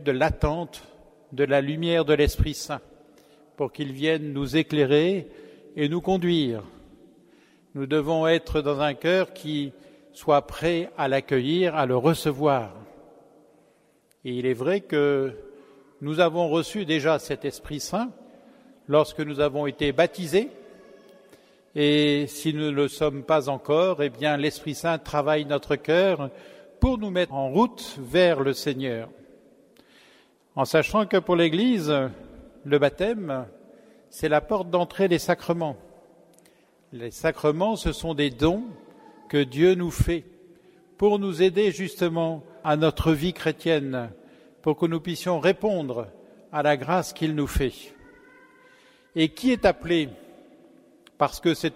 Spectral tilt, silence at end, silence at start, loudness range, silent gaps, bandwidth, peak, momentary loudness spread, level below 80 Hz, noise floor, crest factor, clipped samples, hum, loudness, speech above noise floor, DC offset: -6 dB/octave; 0 s; 0 s; 3 LU; none; 16 kHz; -6 dBFS; 11 LU; -44 dBFS; -63 dBFS; 20 dB; under 0.1%; none; -24 LUFS; 39 dB; under 0.1%